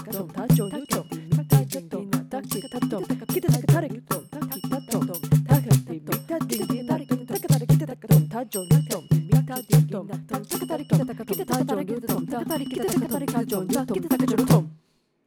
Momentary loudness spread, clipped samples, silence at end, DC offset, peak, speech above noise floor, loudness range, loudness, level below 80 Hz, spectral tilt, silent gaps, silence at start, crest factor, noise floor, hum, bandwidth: 10 LU; under 0.1%; 0.5 s; under 0.1%; -6 dBFS; 39 dB; 4 LU; -24 LUFS; -50 dBFS; -6.5 dB/octave; none; 0 s; 18 dB; -63 dBFS; none; 19 kHz